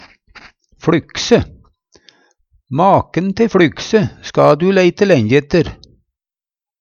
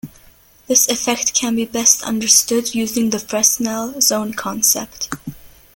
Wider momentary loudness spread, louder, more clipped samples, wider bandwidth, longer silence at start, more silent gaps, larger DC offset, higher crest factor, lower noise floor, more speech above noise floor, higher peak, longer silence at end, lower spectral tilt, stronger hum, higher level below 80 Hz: second, 8 LU vs 12 LU; about the same, -14 LUFS vs -15 LUFS; neither; second, 7.4 kHz vs 17 kHz; first, 0.85 s vs 0.05 s; neither; neither; about the same, 16 dB vs 18 dB; first, under -90 dBFS vs -48 dBFS; first, over 77 dB vs 31 dB; about the same, 0 dBFS vs 0 dBFS; first, 1.05 s vs 0.3 s; first, -6 dB/octave vs -1.5 dB/octave; neither; first, -42 dBFS vs -52 dBFS